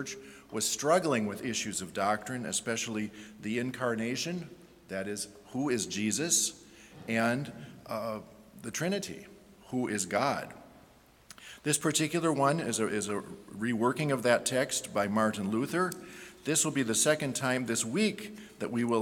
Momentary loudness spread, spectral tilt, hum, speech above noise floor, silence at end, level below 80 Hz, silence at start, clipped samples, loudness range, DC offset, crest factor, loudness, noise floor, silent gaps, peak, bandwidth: 15 LU; -3.5 dB/octave; none; 28 dB; 0 s; -68 dBFS; 0 s; under 0.1%; 5 LU; under 0.1%; 22 dB; -31 LUFS; -59 dBFS; none; -10 dBFS; 18 kHz